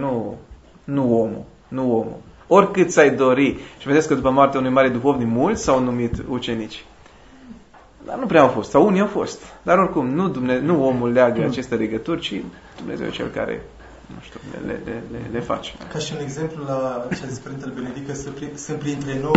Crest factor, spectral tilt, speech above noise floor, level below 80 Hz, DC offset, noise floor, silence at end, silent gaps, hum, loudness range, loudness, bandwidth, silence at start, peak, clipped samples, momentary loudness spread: 20 dB; -6 dB/octave; 26 dB; -46 dBFS; under 0.1%; -46 dBFS; 0 s; none; none; 11 LU; -20 LUFS; 8 kHz; 0 s; 0 dBFS; under 0.1%; 16 LU